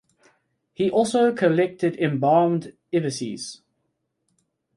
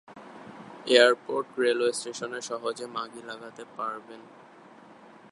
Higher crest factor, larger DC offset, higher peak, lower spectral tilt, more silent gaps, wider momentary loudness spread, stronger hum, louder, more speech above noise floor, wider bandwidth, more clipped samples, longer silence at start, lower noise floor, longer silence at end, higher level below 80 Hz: second, 18 dB vs 28 dB; neither; second, -6 dBFS vs -2 dBFS; first, -6 dB/octave vs -2 dB/octave; neither; second, 11 LU vs 26 LU; neither; first, -22 LUFS vs -27 LUFS; first, 54 dB vs 24 dB; about the same, 11.5 kHz vs 11.5 kHz; neither; first, 0.8 s vs 0.1 s; first, -75 dBFS vs -51 dBFS; about the same, 1.2 s vs 1.1 s; first, -68 dBFS vs -82 dBFS